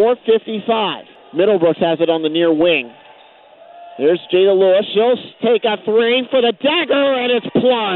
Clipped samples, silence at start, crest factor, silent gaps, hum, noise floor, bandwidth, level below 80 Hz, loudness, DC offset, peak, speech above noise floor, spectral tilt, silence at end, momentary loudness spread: under 0.1%; 0 s; 12 dB; none; none; -44 dBFS; 4.3 kHz; -64 dBFS; -15 LUFS; under 0.1%; -4 dBFS; 30 dB; -10 dB/octave; 0 s; 5 LU